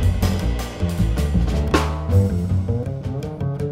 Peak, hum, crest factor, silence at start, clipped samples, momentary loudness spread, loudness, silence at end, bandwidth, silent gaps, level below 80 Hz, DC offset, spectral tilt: 0 dBFS; none; 18 dB; 0 s; under 0.1%; 7 LU; -22 LUFS; 0 s; 16 kHz; none; -26 dBFS; under 0.1%; -7 dB/octave